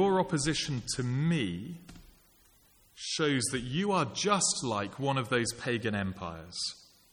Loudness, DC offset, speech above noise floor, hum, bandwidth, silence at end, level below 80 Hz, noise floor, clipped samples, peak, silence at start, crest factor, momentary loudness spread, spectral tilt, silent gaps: -31 LUFS; under 0.1%; 32 dB; none; 19 kHz; 0.35 s; -58 dBFS; -63 dBFS; under 0.1%; -14 dBFS; 0 s; 18 dB; 12 LU; -4 dB/octave; none